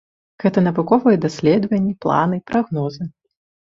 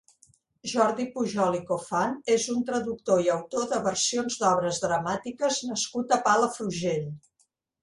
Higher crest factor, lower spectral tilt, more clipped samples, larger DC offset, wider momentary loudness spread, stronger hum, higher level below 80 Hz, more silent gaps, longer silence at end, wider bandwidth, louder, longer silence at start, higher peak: about the same, 16 dB vs 18 dB; first, -8 dB/octave vs -3.5 dB/octave; neither; neither; first, 9 LU vs 6 LU; neither; first, -56 dBFS vs -66 dBFS; neither; about the same, 0.6 s vs 0.65 s; second, 7.6 kHz vs 11.5 kHz; first, -18 LUFS vs -27 LUFS; second, 0.4 s vs 0.65 s; first, -2 dBFS vs -8 dBFS